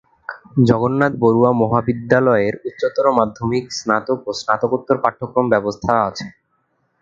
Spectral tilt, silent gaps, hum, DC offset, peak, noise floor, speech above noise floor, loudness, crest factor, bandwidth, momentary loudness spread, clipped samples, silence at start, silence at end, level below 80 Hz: -6.5 dB/octave; none; none; under 0.1%; 0 dBFS; -66 dBFS; 49 dB; -17 LUFS; 18 dB; 7.6 kHz; 8 LU; under 0.1%; 0.3 s; 0.7 s; -50 dBFS